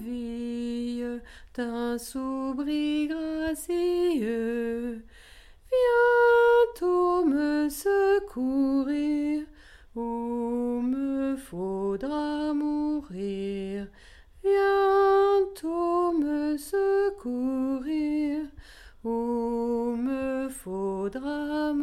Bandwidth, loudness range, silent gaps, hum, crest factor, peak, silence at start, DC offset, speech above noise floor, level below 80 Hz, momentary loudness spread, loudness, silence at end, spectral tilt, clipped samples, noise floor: 15 kHz; 7 LU; none; none; 14 dB; -12 dBFS; 0 s; under 0.1%; 24 dB; -54 dBFS; 12 LU; -27 LUFS; 0 s; -5.5 dB/octave; under 0.1%; -51 dBFS